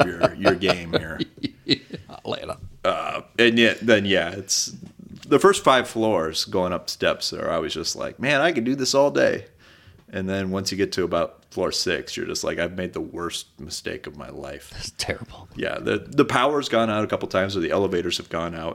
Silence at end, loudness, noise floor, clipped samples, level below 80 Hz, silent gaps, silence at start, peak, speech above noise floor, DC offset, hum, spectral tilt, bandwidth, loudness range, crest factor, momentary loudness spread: 0 s; -23 LUFS; -51 dBFS; under 0.1%; -52 dBFS; none; 0 s; -4 dBFS; 28 dB; under 0.1%; none; -4 dB/octave; 17 kHz; 8 LU; 20 dB; 15 LU